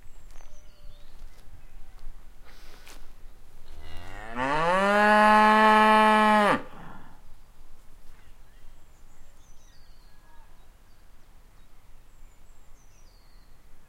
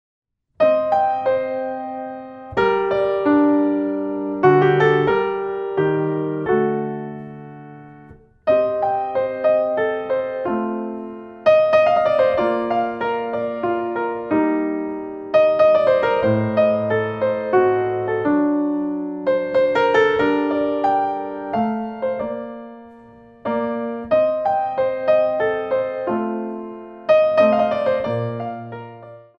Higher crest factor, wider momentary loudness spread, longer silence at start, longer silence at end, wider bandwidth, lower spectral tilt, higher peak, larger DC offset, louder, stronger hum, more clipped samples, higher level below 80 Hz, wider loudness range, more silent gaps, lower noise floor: first, 22 dB vs 16 dB; first, 27 LU vs 14 LU; second, 0 s vs 0.6 s; second, 0.05 s vs 0.2 s; first, 16 kHz vs 6.4 kHz; second, -4.5 dB/octave vs -8 dB/octave; second, -6 dBFS vs -2 dBFS; neither; about the same, -20 LUFS vs -19 LUFS; neither; neither; first, -44 dBFS vs -56 dBFS; first, 13 LU vs 5 LU; neither; first, -49 dBFS vs -45 dBFS